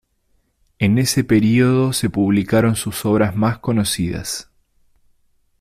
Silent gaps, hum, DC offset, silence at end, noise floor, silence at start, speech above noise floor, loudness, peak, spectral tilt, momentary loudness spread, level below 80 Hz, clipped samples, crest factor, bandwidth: none; none; under 0.1%; 1.2 s; -63 dBFS; 0.8 s; 47 dB; -18 LUFS; -4 dBFS; -5.5 dB/octave; 7 LU; -46 dBFS; under 0.1%; 14 dB; 15.5 kHz